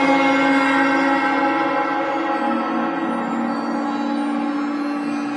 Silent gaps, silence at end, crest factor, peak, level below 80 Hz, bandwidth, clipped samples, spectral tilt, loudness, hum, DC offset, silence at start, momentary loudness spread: none; 0 s; 14 dB; -4 dBFS; -68 dBFS; 11 kHz; under 0.1%; -5 dB/octave; -20 LUFS; none; under 0.1%; 0 s; 7 LU